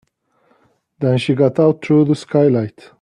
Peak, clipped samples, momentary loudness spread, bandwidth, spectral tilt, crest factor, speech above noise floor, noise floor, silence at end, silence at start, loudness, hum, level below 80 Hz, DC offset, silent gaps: -2 dBFS; under 0.1%; 7 LU; 10.5 kHz; -8 dB/octave; 14 dB; 45 dB; -60 dBFS; 0.35 s; 1 s; -15 LUFS; none; -58 dBFS; under 0.1%; none